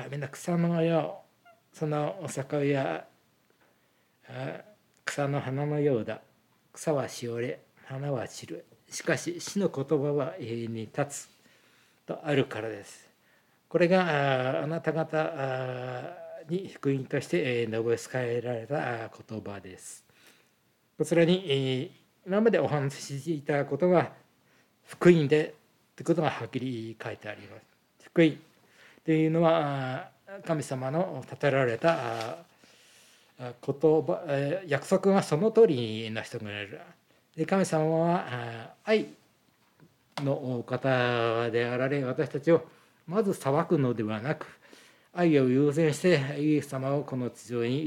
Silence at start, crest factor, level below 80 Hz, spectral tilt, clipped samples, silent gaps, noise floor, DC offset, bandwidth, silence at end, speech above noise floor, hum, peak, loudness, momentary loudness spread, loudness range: 0 s; 22 dB; -80 dBFS; -6.5 dB/octave; under 0.1%; none; -69 dBFS; under 0.1%; 16 kHz; 0 s; 41 dB; none; -8 dBFS; -29 LUFS; 16 LU; 6 LU